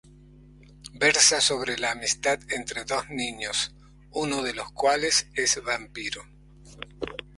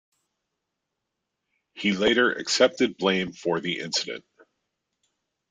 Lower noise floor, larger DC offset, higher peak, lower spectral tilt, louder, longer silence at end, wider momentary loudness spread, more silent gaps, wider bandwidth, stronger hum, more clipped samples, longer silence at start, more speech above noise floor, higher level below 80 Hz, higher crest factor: second, -51 dBFS vs -82 dBFS; neither; about the same, -4 dBFS vs -6 dBFS; second, -1 dB/octave vs -3.5 dB/octave; about the same, -24 LUFS vs -24 LUFS; second, 0.15 s vs 1.3 s; first, 18 LU vs 7 LU; neither; first, 11.5 kHz vs 9.6 kHz; neither; neither; second, 0.85 s vs 1.75 s; second, 25 dB vs 58 dB; first, -54 dBFS vs -64 dBFS; about the same, 22 dB vs 22 dB